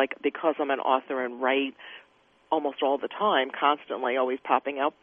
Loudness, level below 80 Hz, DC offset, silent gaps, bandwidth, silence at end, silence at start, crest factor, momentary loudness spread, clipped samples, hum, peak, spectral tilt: -27 LUFS; -80 dBFS; under 0.1%; none; 3.8 kHz; 0.1 s; 0 s; 20 dB; 5 LU; under 0.1%; none; -8 dBFS; -6.5 dB/octave